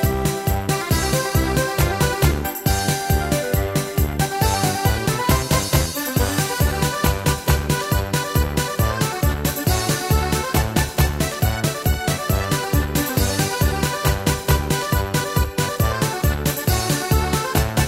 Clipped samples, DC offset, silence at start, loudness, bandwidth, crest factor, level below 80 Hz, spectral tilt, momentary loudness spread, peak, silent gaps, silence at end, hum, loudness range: under 0.1%; under 0.1%; 0 s; -20 LUFS; 16.5 kHz; 18 dB; -26 dBFS; -4.5 dB/octave; 2 LU; -2 dBFS; none; 0 s; none; 1 LU